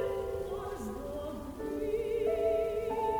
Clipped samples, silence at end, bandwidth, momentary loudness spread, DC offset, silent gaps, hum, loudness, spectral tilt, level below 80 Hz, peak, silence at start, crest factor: under 0.1%; 0 s; over 20 kHz; 9 LU; under 0.1%; none; none; -35 LUFS; -6.5 dB/octave; -50 dBFS; -20 dBFS; 0 s; 14 dB